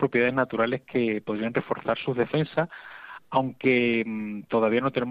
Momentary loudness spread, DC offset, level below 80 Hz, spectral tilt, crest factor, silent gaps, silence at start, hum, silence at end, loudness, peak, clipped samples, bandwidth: 9 LU; under 0.1%; -64 dBFS; -9 dB/octave; 18 dB; none; 0 s; none; 0 s; -26 LUFS; -8 dBFS; under 0.1%; 5 kHz